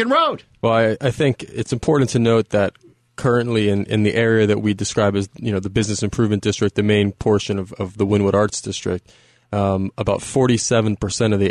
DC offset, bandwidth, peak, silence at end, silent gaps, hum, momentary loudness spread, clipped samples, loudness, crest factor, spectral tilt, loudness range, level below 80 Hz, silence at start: under 0.1%; 11.5 kHz; -6 dBFS; 0 s; none; none; 8 LU; under 0.1%; -19 LUFS; 14 dB; -5.5 dB/octave; 2 LU; -46 dBFS; 0 s